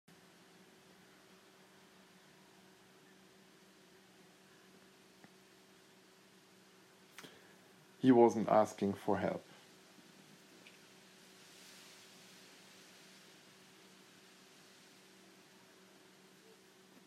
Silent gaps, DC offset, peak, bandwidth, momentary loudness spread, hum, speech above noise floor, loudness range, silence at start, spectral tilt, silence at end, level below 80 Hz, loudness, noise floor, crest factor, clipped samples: none; under 0.1%; -14 dBFS; 14.5 kHz; 30 LU; none; 33 dB; 26 LU; 8.05 s; -6.5 dB/octave; 7.65 s; -88 dBFS; -32 LUFS; -64 dBFS; 28 dB; under 0.1%